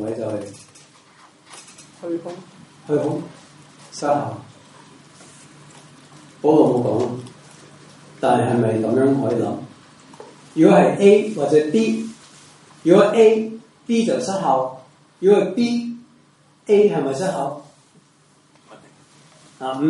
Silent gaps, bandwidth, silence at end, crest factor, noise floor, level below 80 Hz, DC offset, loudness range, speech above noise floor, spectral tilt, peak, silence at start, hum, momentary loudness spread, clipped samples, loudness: none; 11.5 kHz; 0 s; 20 dB; -55 dBFS; -68 dBFS; under 0.1%; 11 LU; 38 dB; -6.5 dB/octave; -2 dBFS; 0 s; none; 22 LU; under 0.1%; -18 LUFS